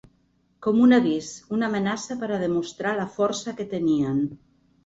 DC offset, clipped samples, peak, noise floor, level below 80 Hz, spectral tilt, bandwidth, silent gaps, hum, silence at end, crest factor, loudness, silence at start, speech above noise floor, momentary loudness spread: under 0.1%; under 0.1%; -8 dBFS; -65 dBFS; -62 dBFS; -5.5 dB/octave; 8 kHz; none; none; 0.5 s; 16 dB; -24 LUFS; 0.6 s; 42 dB; 12 LU